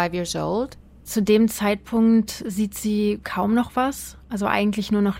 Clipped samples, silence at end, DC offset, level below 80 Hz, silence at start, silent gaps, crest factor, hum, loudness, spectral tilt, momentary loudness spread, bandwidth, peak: under 0.1%; 0 s; under 0.1%; -48 dBFS; 0 s; none; 18 dB; none; -22 LUFS; -5.5 dB/octave; 9 LU; 16.5 kHz; -4 dBFS